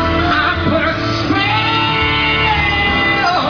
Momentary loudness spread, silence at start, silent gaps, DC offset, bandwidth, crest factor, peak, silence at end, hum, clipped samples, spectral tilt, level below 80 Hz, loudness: 3 LU; 0 s; none; under 0.1%; 5.4 kHz; 12 dB; -2 dBFS; 0 s; none; under 0.1%; -5.5 dB/octave; -30 dBFS; -13 LUFS